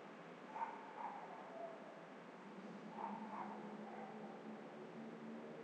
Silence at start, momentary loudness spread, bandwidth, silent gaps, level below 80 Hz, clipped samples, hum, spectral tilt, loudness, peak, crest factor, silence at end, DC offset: 0 s; 7 LU; 9.4 kHz; none; under -90 dBFS; under 0.1%; none; -6.5 dB/octave; -52 LUFS; -32 dBFS; 20 dB; 0 s; under 0.1%